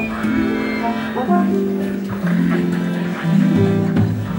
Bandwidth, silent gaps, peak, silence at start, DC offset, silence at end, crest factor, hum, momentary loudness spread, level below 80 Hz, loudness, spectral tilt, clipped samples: 16.5 kHz; none; -4 dBFS; 0 s; under 0.1%; 0 s; 14 dB; none; 6 LU; -46 dBFS; -18 LUFS; -8 dB/octave; under 0.1%